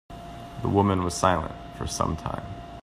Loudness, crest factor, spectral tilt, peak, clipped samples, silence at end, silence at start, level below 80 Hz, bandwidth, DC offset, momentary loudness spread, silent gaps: -26 LUFS; 22 dB; -5.5 dB/octave; -6 dBFS; under 0.1%; 0 s; 0.1 s; -44 dBFS; 14.5 kHz; under 0.1%; 17 LU; none